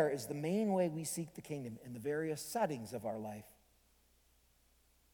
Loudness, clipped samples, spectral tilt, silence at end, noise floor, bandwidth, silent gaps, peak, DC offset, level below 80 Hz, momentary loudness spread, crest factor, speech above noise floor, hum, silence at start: -39 LUFS; under 0.1%; -5.5 dB/octave; 1.6 s; -71 dBFS; 19 kHz; none; -20 dBFS; under 0.1%; -74 dBFS; 11 LU; 20 dB; 33 dB; none; 0 s